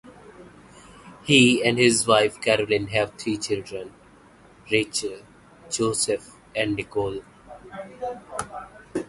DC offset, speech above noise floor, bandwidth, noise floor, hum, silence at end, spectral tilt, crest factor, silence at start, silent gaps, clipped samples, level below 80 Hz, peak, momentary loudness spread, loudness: under 0.1%; 29 dB; 11.5 kHz; -52 dBFS; none; 0.05 s; -3.5 dB/octave; 22 dB; 0.05 s; none; under 0.1%; -54 dBFS; -2 dBFS; 20 LU; -23 LUFS